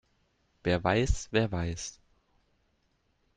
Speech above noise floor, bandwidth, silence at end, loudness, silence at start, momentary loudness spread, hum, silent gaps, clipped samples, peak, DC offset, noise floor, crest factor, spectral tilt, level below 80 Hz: 44 dB; 9.6 kHz; 1.45 s; -30 LUFS; 0.65 s; 11 LU; none; none; under 0.1%; -12 dBFS; under 0.1%; -73 dBFS; 22 dB; -5 dB/octave; -42 dBFS